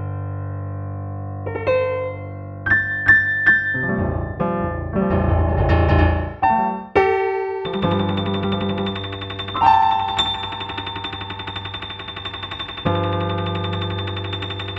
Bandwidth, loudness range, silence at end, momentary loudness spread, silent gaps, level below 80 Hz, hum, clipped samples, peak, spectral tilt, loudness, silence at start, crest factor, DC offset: 7.8 kHz; 7 LU; 0 s; 14 LU; none; -32 dBFS; 50 Hz at -50 dBFS; under 0.1%; -2 dBFS; -7 dB/octave; -20 LUFS; 0 s; 18 dB; under 0.1%